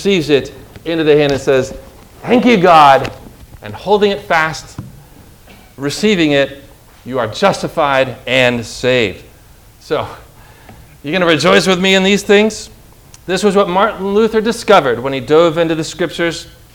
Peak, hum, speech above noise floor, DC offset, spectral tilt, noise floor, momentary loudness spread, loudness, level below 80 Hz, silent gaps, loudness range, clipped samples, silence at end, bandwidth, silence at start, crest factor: 0 dBFS; none; 29 dB; under 0.1%; -4.5 dB/octave; -42 dBFS; 17 LU; -13 LUFS; -42 dBFS; none; 5 LU; 0.4%; 0.25 s; 19.5 kHz; 0 s; 14 dB